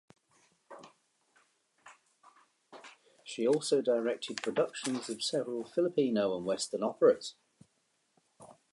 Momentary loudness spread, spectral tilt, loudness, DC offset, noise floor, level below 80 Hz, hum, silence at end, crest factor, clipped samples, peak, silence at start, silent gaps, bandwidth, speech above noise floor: 25 LU; -4 dB/octave; -32 LUFS; under 0.1%; -76 dBFS; -82 dBFS; none; 0.2 s; 22 dB; under 0.1%; -12 dBFS; 0.7 s; none; 11.5 kHz; 45 dB